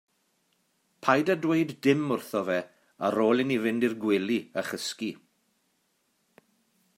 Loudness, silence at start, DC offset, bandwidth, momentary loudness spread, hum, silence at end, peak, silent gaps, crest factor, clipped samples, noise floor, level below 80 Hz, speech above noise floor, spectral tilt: -27 LUFS; 1.05 s; under 0.1%; 16 kHz; 9 LU; none; 1.85 s; -6 dBFS; none; 22 dB; under 0.1%; -73 dBFS; -78 dBFS; 47 dB; -5.5 dB/octave